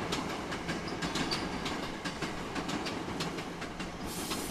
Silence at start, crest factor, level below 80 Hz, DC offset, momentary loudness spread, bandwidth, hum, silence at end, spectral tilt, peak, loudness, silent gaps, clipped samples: 0 s; 18 dB; -52 dBFS; under 0.1%; 5 LU; 15.5 kHz; none; 0 s; -4 dB/octave; -18 dBFS; -36 LUFS; none; under 0.1%